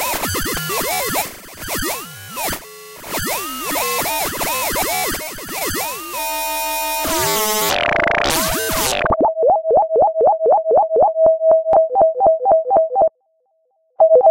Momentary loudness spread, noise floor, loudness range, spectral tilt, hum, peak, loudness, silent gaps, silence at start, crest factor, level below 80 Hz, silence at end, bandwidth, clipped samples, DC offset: 10 LU; -64 dBFS; 8 LU; -2.5 dB/octave; none; -4 dBFS; -17 LUFS; none; 0 s; 14 dB; -40 dBFS; 0 s; 16 kHz; under 0.1%; under 0.1%